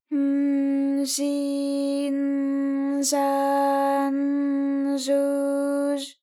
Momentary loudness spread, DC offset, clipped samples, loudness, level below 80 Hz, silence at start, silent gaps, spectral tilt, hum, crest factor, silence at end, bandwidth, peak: 3 LU; under 0.1%; under 0.1%; -24 LUFS; under -90 dBFS; 0.1 s; none; -2 dB/octave; none; 12 dB; 0.1 s; 15 kHz; -12 dBFS